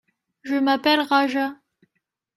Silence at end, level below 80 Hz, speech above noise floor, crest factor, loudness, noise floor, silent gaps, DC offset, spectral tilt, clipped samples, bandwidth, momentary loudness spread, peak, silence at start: 0.85 s; -74 dBFS; 57 dB; 18 dB; -21 LUFS; -77 dBFS; none; under 0.1%; -3.5 dB/octave; under 0.1%; 13 kHz; 10 LU; -6 dBFS; 0.45 s